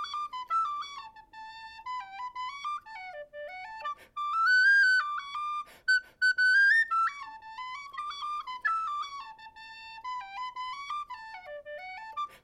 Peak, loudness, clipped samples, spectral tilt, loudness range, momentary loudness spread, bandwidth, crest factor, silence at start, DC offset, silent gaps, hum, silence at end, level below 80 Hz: -16 dBFS; -28 LUFS; under 0.1%; 1 dB/octave; 15 LU; 22 LU; 12 kHz; 16 dB; 0 s; under 0.1%; none; none; 0.05 s; -72 dBFS